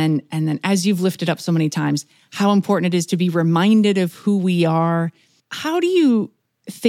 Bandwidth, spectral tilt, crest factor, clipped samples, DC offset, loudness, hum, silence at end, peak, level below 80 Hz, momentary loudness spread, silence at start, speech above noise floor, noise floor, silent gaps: 16 kHz; -6 dB/octave; 14 dB; under 0.1%; under 0.1%; -18 LUFS; none; 0 s; -4 dBFS; -74 dBFS; 10 LU; 0 s; 20 dB; -38 dBFS; none